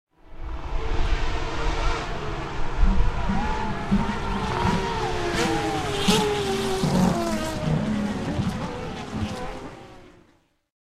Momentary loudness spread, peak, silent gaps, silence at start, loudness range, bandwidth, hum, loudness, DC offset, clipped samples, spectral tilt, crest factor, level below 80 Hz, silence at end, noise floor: 12 LU; -6 dBFS; none; 0.25 s; 5 LU; 14.5 kHz; none; -26 LUFS; under 0.1%; under 0.1%; -5 dB/octave; 18 dB; -30 dBFS; 0.8 s; -62 dBFS